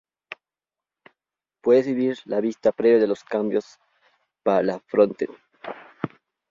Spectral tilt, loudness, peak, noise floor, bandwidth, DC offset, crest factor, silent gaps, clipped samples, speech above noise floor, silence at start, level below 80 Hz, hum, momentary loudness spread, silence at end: -7 dB/octave; -22 LUFS; -4 dBFS; under -90 dBFS; 7.4 kHz; under 0.1%; 20 dB; none; under 0.1%; over 69 dB; 1.65 s; -68 dBFS; none; 20 LU; 0.45 s